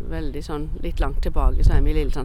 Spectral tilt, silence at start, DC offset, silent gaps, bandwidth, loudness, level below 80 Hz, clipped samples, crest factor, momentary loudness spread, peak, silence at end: -7.5 dB/octave; 0 s; under 0.1%; none; 9.4 kHz; -25 LUFS; -20 dBFS; under 0.1%; 16 dB; 9 LU; -4 dBFS; 0 s